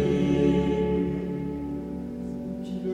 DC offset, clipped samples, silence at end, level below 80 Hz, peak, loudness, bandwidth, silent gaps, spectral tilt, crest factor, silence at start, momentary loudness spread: under 0.1%; under 0.1%; 0 s; -42 dBFS; -12 dBFS; -27 LUFS; 9.6 kHz; none; -8.5 dB/octave; 16 dB; 0 s; 12 LU